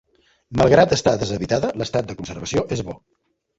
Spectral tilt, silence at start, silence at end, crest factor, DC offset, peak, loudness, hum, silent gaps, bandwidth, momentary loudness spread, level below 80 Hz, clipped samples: -5.5 dB/octave; 0.5 s; 0.65 s; 20 dB; under 0.1%; -2 dBFS; -20 LUFS; none; none; 8 kHz; 16 LU; -44 dBFS; under 0.1%